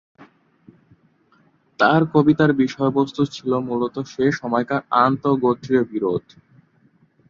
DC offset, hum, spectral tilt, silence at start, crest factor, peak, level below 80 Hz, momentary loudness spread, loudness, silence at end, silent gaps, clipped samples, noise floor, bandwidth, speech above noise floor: under 0.1%; none; -7.5 dB/octave; 0.2 s; 18 dB; -2 dBFS; -60 dBFS; 8 LU; -20 LUFS; 1.1 s; none; under 0.1%; -59 dBFS; 7.4 kHz; 40 dB